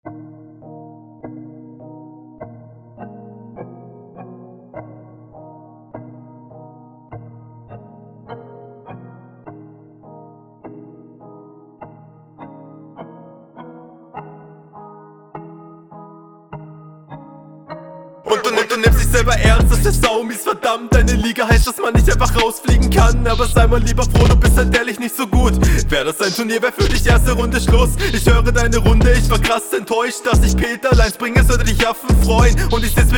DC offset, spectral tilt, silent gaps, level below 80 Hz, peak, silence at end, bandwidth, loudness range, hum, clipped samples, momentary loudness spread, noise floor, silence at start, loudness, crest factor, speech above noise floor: under 0.1%; -5 dB/octave; none; -20 dBFS; 0 dBFS; 0 s; 18.5 kHz; 24 LU; none; under 0.1%; 24 LU; -43 dBFS; 0.05 s; -15 LUFS; 16 dB; 30 dB